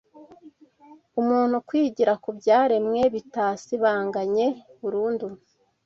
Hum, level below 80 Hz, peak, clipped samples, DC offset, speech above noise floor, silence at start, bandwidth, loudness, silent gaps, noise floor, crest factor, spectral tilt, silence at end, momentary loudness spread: none; -66 dBFS; -8 dBFS; under 0.1%; under 0.1%; 30 dB; 0.15 s; 7.6 kHz; -24 LUFS; none; -53 dBFS; 16 dB; -6 dB/octave; 0.5 s; 9 LU